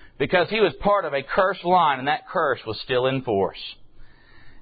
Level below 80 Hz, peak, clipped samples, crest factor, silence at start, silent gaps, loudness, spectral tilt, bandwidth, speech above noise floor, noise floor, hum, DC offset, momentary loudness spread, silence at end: -50 dBFS; -4 dBFS; under 0.1%; 18 dB; 0 s; none; -22 LUFS; -10 dB/octave; 5 kHz; 22 dB; -44 dBFS; none; under 0.1%; 7 LU; 0 s